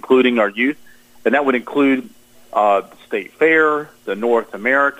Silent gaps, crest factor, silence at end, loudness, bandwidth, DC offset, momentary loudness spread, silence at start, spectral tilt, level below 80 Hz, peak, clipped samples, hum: none; 14 dB; 0.05 s; -17 LUFS; 15.5 kHz; under 0.1%; 12 LU; 0.05 s; -5.5 dB/octave; -64 dBFS; -4 dBFS; under 0.1%; none